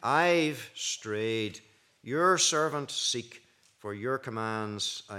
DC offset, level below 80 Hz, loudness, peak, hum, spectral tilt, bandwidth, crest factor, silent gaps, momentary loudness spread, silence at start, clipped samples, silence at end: under 0.1%; -82 dBFS; -29 LUFS; -10 dBFS; none; -2.5 dB/octave; 16 kHz; 20 dB; none; 16 LU; 0 s; under 0.1%; 0 s